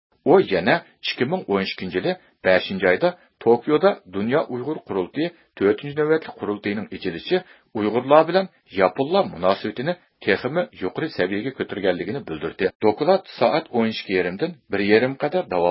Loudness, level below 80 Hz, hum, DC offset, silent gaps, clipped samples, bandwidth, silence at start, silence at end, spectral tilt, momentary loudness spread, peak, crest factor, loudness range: -22 LUFS; -56 dBFS; none; under 0.1%; 12.75-12.80 s; under 0.1%; 5.8 kHz; 0.25 s; 0 s; -10.5 dB/octave; 10 LU; 0 dBFS; 22 dB; 3 LU